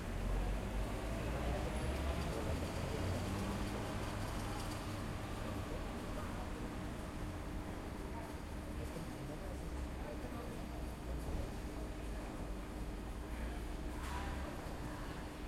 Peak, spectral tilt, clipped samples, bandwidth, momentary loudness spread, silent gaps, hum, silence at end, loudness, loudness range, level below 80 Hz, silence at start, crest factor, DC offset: -28 dBFS; -5.5 dB/octave; under 0.1%; 16 kHz; 6 LU; none; none; 0 s; -44 LUFS; 5 LU; -46 dBFS; 0 s; 14 dB; under 0.1%